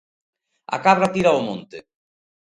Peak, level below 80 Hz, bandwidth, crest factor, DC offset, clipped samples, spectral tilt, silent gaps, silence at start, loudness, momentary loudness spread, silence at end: -2 dBFS; -60 dBFS; 11.5 kHz; 20 dB; under 0.1%; under 0.1%; -5.5 dB/octave; none; 0.7 s; -19 LUFS; 13 LU; 0.75 s